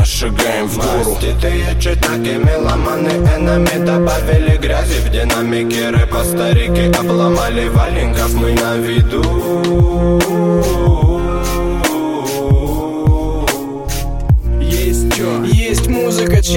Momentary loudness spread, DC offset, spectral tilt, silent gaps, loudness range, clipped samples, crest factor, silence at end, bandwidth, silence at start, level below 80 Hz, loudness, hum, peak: 4 LU; 1%; -5.5 dB/octave; none; 2 LU; under 0.1%; 12 dB; 0 s; 17 kHz; 0 s; -18 dBFS; -14 LUFS; none; 0 dBFS